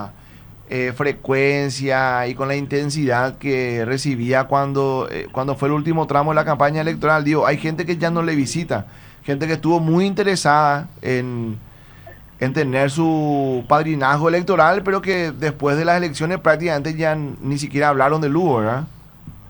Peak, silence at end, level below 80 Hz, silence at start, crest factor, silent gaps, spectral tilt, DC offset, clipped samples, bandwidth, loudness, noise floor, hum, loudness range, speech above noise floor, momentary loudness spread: 0 dBFS; 0 s; -48 dBFS; 0 s; 18 dB; none; -6 dB/octave; under 0.1%; under 0.1%; over 20 kHz; -19 LUFS; -42 dBFS; none; 2 LU; 24 dB; 8 LU